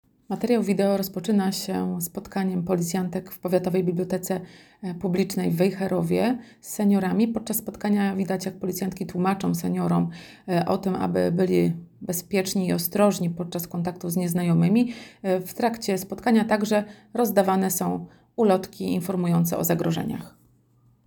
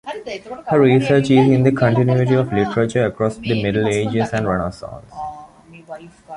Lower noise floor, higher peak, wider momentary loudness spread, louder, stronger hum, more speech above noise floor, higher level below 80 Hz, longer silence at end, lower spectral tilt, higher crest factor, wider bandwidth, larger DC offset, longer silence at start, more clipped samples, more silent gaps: first, -61 dBFS vs -42 dBFS; second, -6 dBFS vs -2 dBFS; second, 9 LU vs 19 LU; second, -25 LUFS vs -17 LUFS; neither; first, 37 dB vs 25 dB; second, -60 dBFS vs -46 dBFS; first, 0.75 s vs 0 s; second, -6 dB/octave vs -7.5 dB/octave; about the same, 18 dB vs 16 dB; first, over 20 kHz vs 11.5 kHz; neither; first, 0.3 s vs 0.05 s; neither; neither